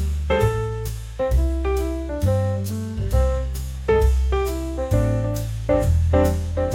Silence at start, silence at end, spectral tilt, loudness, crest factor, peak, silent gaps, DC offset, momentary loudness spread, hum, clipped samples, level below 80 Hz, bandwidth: 0 s; 0 s; -7 dB/octave; -22 LUFS; 14 dB; -6 dBFS; none; under 0.1%; 8 LU; none; under 0.1%; -24 dBFS; 17 kHz